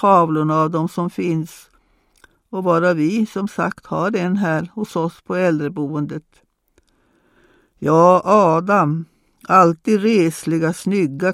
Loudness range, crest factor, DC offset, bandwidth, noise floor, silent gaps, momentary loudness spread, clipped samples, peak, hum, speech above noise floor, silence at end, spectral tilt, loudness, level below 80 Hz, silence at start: 7 LU; 18 dB; under 0.1%; 15 kHz; -61 dBFS; none; 12 LU; under 0.1%; 0 dBFS; none; 44 dB; 0 s; -7 dB/octave; -18 LUFS; -60 dBFS; 0 s